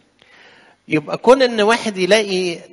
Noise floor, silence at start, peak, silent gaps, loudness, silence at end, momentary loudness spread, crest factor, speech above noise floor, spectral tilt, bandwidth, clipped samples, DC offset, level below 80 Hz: -49 dBFS; 0.9 s; 0 dBFS; none; -16 LUFS; 0.1 s; 9 LU; 18 dB; 33 dB; -4 dB/octave; 11.5 kHz; under 0.1%; under 0.1%; -56 dBFS